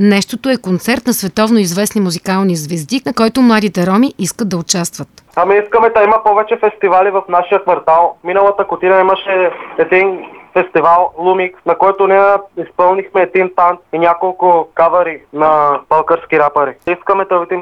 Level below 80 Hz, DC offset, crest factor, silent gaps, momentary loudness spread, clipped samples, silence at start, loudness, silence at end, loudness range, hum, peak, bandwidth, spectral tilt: -52 dBFS; under 0.1%; 12 dB; none; 7 LU; under 0.1%; 0 s; -12 LUFS; 0 s; 2 LU; none; 0 dBFS; 15 kHz; -5 dB/octave